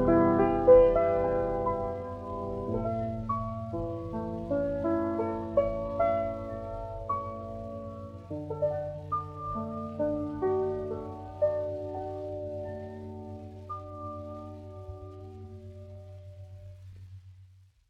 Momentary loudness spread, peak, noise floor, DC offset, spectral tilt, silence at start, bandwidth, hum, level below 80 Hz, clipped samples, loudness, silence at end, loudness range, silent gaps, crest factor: 20 LU; -8 dBFS; -57 dBFS; under 0.1%; -10 dB/octave; 0 s; 5.8 kHz; none; -48 dBFS; under 0.1%; -30 LUFS; 0.45 s; 15 LU; none; 22 dB